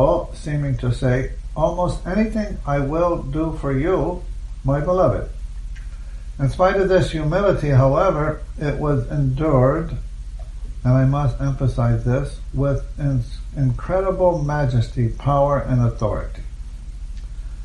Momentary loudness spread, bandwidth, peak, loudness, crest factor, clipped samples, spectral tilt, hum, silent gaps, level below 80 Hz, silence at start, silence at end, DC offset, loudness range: 18 LU; 10.5 kHz; -4 dBFS; -20 LUFS; 16 dB; under 0.1%; -8.5 dB/octave; none; none; -30 dBFS; 0 s; 0 s; under 0.1%; 3 LU